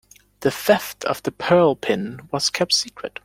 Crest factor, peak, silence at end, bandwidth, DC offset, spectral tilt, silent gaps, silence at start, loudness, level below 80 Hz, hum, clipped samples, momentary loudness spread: 20 dB; -2 dBFS; 0.15 s; 16.5 kHz; under 0.1%; -3.5 dB/octave; none; 0.4 s; -21 LUFS; -58 dBFS; none; under 0.1%; 9 LU